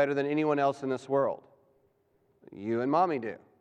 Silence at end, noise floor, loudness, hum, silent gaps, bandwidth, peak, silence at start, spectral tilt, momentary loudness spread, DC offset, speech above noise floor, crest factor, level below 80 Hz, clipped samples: 0.25 s; -70 dBFS; -29 LUFS; none; none; 9.4 kHz; -14 dBFS; 0 s; -7 dB/octave; 12 LU; under 0.1%; 41 dB; 18 dB; -82 dBFS; under 0.1%